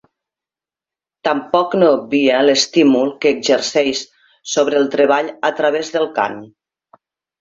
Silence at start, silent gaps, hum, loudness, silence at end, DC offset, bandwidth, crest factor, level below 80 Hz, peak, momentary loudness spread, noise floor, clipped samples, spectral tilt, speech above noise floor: 1.25 s; none; none; -16 LUFS; 0.95 s; under 0.1%; 7.8 kHz; 16 dB; -62 dBFS; 0 dBFS; 9 LU; -89 dBFS; under 0.1%; -3.5 dB/octave; 74 dB